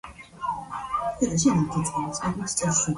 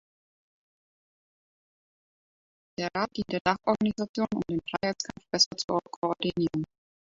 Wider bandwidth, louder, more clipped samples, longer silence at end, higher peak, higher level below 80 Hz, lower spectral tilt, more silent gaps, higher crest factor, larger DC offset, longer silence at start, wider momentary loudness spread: first, 11.5 kHz vs 7.8 kHz; first, -26 LUFS vs -29 LUFS; neither; second, 0 s vs 0.55 s; about the same, -10 dBFS vs -8 dBFS; first, -50 dBFS vs -62 dBFS; about the same, -4.5 dB/octave vs -4 dB/octave; second, none vs 3.41-3.45 s, 4.09-4.14 s, 5.46-5.51 s, 5.64-5.68 s, 5.96-6.02 s; second, 18 dB vs 24 dB; neither; second, 0.05 s vs 2.8 s; about the same, 11 LU vs 10 LU